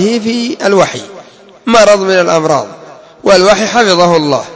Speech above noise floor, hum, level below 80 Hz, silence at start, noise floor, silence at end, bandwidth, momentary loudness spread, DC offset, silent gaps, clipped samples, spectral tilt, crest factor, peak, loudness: 26 dB; none; -48 dBFS; 0 s; -35 dBFS; 0 s; 8 kHz; 12 LU; under 0.1%; none; 0.9%; -4 dB/octave; 10 dB; 0 dBFS; -9 LUFS